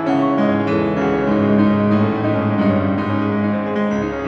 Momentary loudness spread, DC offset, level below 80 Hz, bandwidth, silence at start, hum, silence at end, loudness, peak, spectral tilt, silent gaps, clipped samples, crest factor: 5 LU; under 0.1%; -46 dBFS; 6.4 kHz; 0 s; none; 0 s; -17 LUFS; -2 dBFS; -8.5 dB/octave; none; under 0.1%; 14 dB